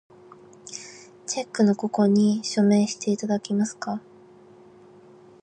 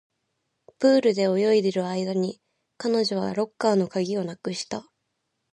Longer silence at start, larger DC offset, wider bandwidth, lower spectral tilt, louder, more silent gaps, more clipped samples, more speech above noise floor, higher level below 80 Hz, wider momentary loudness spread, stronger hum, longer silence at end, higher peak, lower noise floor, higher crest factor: second, 0.65 s vs 0.8 s; neither; second, 9.4 kHz vs 11 kHz; about the same, -5.5 dB/octave vs -5.5 dB/octave; about the same, -23 LUFS vs -24 LUFS; neither; neither; second, 28 dB vs 54 dB; about the same, -72 dBFS vs -72 dBFS; first, 19 LU vs 11 LU; neither; first, 1.45 s vs 0.7 s; about the same, -10 dBFS vs -8 dBFS; second, -50 dBFS vs -77 dBFS; about the same, 16 dB vs 18 dB